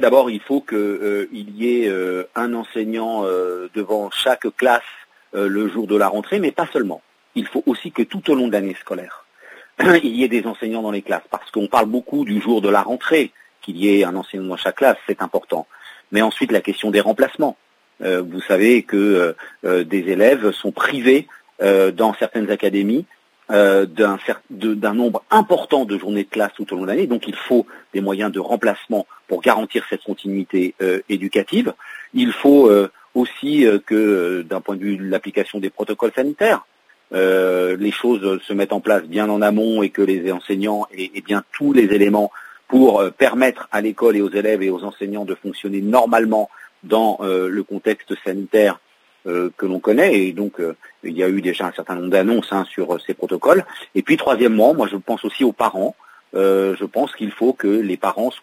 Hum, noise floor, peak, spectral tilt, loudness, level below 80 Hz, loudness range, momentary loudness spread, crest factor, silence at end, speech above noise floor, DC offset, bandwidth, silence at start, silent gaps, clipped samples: none; -45 dBFS; 0 dBFS; -5.5 dB/octave; -18 LUFS; -68 dBFS; 4 LU; 11 LU; 18 dB; 0.05 s; 27 dB; under 0.1%; 16 kHz; 0 s; none; under 0.1%